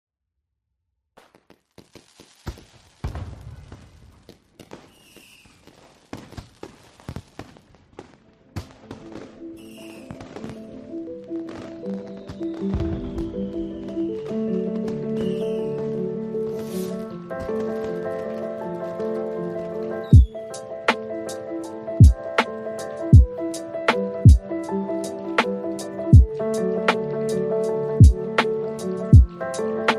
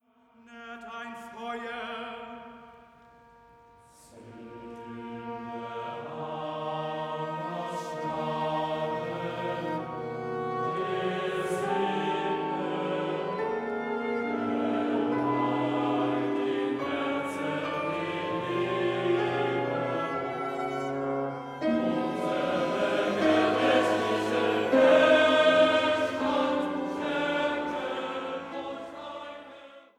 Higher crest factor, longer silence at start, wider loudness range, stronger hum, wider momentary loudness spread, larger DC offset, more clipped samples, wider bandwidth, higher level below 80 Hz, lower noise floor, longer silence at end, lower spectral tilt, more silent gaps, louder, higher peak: about the same, 22 dB vs 20 dB; first, 2.2 s vs 0.5 s; first, 22 LU vs 17 LU; neither; first, 24 LU vs 16 LU; neither; neither; about the same, 12.5 kHz vs 13.5 kHz; first, -28 dBFS vs -68 dBFS; first, -80 dBFS vs -59 dBFS; second, 0 s vs 0.2 s; first, -7.5 dB/octave vs -5.5 dB/octave; neither; first, -22 LUFS vs -28 LUFS; first, 0 dBFS vs -10 dBFS